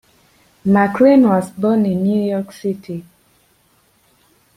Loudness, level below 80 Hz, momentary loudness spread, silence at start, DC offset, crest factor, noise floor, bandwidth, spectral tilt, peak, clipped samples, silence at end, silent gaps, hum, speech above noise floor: -16 LUFS; -58 dBFS; 15 LU; 0.65 s; under 0.1%; 16 dB; -57 dBFS; 14 kHz; -8 dB/octave; -2 dBFS; under 0.1%; 1.55 s; none; none; 43 dB